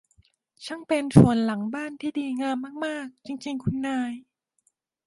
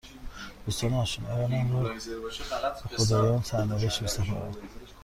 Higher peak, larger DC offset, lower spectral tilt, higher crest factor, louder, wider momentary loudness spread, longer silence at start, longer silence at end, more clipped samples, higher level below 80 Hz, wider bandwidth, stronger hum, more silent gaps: first, -2 dBFS vs -12 dBFS; neither; first, -7 dB/octave vs -5 dB/octave; first, 24 dB vs 18 dB; first, -25 LUFS vs -29 LUFS; first, 19 LU vs 16 LU; first, 0.6 s vs 0.05 s; first, 0.85 s vs 0 s; neither; second, -54 dBFS vs -46 dBFS; second, 11.5 kHz vs 15.5 kHz; neither; neither